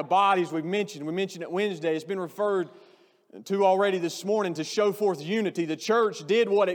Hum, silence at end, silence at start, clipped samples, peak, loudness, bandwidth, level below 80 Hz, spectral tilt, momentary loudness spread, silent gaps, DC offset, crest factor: none; 0 s; 0 s; under 0.1%; -10 dBFS; -26 LUFS; 19 kHz; under -90 dBFS; -5 dB/octave; 9 LU; none; under 0.1%; 16 dB